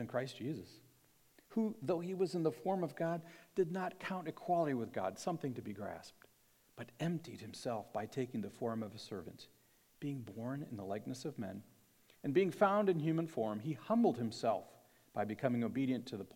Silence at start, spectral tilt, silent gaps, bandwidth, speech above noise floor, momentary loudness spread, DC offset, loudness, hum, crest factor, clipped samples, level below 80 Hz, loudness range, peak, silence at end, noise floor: 0 s; -7 dB/octave; none; 17 kHz; 33 dB; 14 LU; under 0.1%; -39 LUFS; none; 22 dB; under 0.1%; -82 dBFS; 9 LU; -16 dBFS; 0.05 s; -71 dBFS